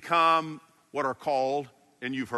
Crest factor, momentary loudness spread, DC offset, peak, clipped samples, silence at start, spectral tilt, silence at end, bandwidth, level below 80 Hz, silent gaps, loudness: 18 dB; 19 LU; under 0.1%; -10 dBFS; under 0.1%; 0 s; -5 dB/octave; 0 s; 12 kHz; -74 dBFS; none; -28 LUFS